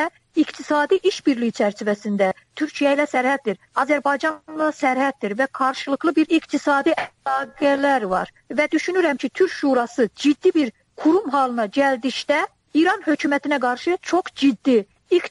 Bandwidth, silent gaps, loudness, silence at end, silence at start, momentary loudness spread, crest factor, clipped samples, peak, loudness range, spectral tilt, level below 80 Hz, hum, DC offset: 11.5 kHz; none; -21 LUFS; 0 s; 0 s; 5 LU; 14 dB; under 0.1%; -6 dBFS; 1 LU; -4.5 dB/octave; -64 dBFS; none; under 0.1%